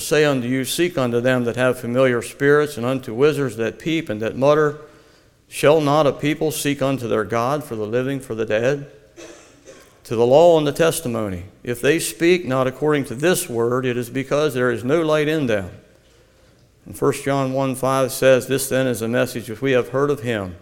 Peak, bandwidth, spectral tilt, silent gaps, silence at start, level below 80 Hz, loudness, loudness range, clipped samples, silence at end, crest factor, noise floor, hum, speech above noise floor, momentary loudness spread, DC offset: 0 dBFS; 17.5 kHz; -5 dB/octave; none; 0 s; -52 dBFS; -19 LUFS; 4 LU; under 0.1%; 0.05 s; 18 dB; -53 dBFS; none; 34 dB; 9 LU; under 0.1%